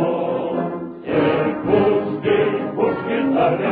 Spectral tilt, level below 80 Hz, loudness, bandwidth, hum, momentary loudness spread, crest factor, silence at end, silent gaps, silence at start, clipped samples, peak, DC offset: -11 dB/octave; -52 dBFS; -20 LUFS; 4.8 kHz; none; 6 LU; 14 dB; 0 s; none; 0 s; under 0.1%; -4 dBFS; under 0.1%